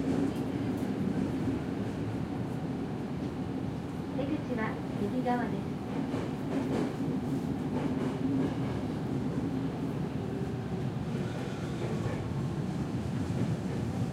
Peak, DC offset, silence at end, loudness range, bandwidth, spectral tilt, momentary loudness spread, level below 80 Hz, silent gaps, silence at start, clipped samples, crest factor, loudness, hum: -18 dBFS; under 0.1%; 0 s; 2 LU; 15 kHz; -7.5 dB/octave; 4 LU; -52 dBFS; none; 0 s; under 0.1%; 14 dB; -34 LUFS; none